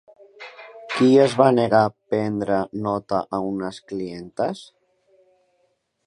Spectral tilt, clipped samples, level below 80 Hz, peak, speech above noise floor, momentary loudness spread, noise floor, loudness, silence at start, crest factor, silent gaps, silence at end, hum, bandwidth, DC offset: -6.5 dB/octave; under 0.1%; -60 dBFS; -2 dBFS; 48 dB; 23 LU; -69 dBFS; -21 LUFS; 0.4 s; 20 dB; none; 1.45 s; none; 11 kHz; under 0.1%